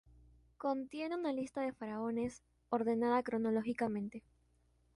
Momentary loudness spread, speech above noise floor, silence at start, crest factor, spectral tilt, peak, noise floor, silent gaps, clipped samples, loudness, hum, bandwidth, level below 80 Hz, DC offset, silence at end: 8 LU; 36 dB; 0.6 s; 16 dB; -6.5 dB/octave; -22 dBFS; -73 dBFS; none; under 0.1%; -38 LUFS; none; 11.5 kHz; -70 dBFS; under 0.1%; 0.75 s